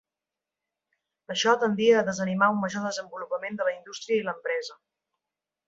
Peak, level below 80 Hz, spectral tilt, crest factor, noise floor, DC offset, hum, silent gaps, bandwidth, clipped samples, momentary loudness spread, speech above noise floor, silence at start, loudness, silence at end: -6 dBFS; -72 dBFS; -4.5 dB/octave; 22 dB; -89 dBFS; under 0.1%; none; none; 7.8 kHz; under 0.1%; 12 LU; 63 dB; 1.3 s; -26 LUFS; 0.95 s